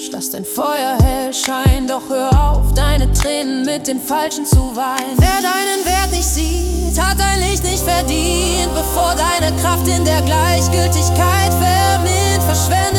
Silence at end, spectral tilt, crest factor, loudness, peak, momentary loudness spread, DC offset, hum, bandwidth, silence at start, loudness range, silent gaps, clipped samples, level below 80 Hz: 0 s; -4 dB/octave; 14 dB; -15 LUFS; -2 dBFS; 5 LU; under 0.1%; none; 18 kHz; 0 s; 2 LU; none; under 0.1%; -20 dBFS